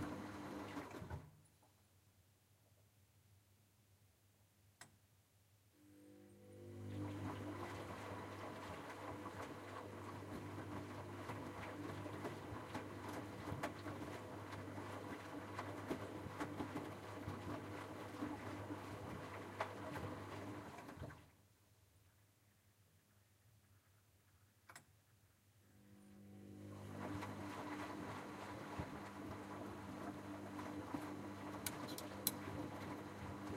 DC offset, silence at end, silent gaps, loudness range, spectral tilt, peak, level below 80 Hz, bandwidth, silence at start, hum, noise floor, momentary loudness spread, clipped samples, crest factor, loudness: under 0.1%; 0 s; none; 15 LU; -5 dB/octave; -18 dBFS; -72 dBFS; 16 kHz; 0 s; none; -74 dBFS; 13 LU; under 0.1%; 32 dB; -50 LUFS